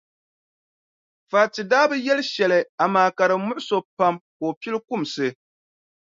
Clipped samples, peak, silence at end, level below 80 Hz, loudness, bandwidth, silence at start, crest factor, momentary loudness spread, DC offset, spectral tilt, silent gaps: under 0.1%; -4 dBFS; 0.8 s; -74 dBFS; -22 LUFS; 7.6 kHz; 1.3 s; 20 dB; 9 LU; under 0.1%; -4.5 dB/octave; 2.69-2.78 s, 3.85-3.97 s, 4.21-4.40 s, 4.57-4.61 s